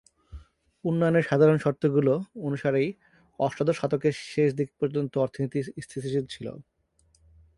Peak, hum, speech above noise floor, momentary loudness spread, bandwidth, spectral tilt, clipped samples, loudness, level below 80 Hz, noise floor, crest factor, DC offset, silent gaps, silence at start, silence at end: -8 dBFS; none; 41 dB; 12 LU; 11.5 kHz; -7.5 dB/octave; under 0.1%; -26 LUFS; -58 dBFS; -67 dBFS; 18 dB; under 0.1%; none; 0.3 s; 0.95 s